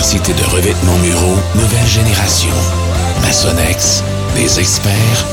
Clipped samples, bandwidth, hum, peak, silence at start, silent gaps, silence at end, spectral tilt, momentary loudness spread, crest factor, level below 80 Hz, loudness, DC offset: under 0.1%; 17 kHz; none; 0 dBFS; 0 s; none; 0 s; -4 dB/octave; 3 LU; 12 dB; -22 dBFS; -11 LUFS; under 0.1%